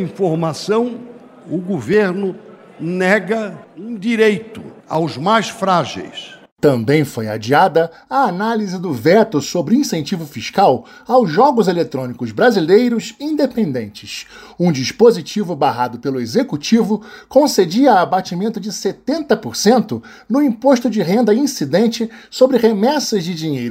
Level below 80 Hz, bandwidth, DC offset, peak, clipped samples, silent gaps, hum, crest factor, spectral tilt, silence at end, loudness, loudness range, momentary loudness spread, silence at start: -58 dBFS; 16 kHz; under 0.1%; 0 dBFS; under 0.1%; 6.52-6.57 s; none; 16 dB; -5.5 dB/octave; 0 s; -16 LUFS; 3 LU; 12 LU; 0 s